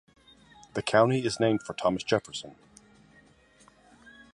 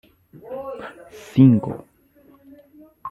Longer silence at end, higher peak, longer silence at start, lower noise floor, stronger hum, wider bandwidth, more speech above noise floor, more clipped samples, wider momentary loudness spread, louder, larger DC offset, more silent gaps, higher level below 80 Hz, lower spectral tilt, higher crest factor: first, 1.8 s vs 0 s; second, -6 dBFS vs -2 dBFS; first, 0.75 s vs 0.45 s; first, -60 dBFS vs -54 dBFS; neither; about the same, 11.5 kHz vs 12 kHz; about the same, 33 dB vs 36 dB; neither; second, 16 LU vs 24 LU; second, -27 LUFS vs -18 LUFS; neither; neither; about the same, -62 dBFS vs -60 dBFS; second, -5 dB/octave vs -9.5 dB/octave; about the same, 24 dB vs 20 dB